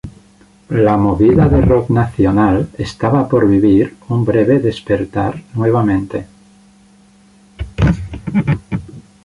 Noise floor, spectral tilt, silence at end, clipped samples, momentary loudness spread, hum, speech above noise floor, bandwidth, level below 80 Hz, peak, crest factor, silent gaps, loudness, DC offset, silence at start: -47 dBFS; -9 dB/octave; 0.25 s; under 0.1%; 12 LU; none; 34 dB; 11 kHz; -30 dBFS; -2 dBFS; 14 dB; none; -14 LUFS; under 0.1%; 0.05 s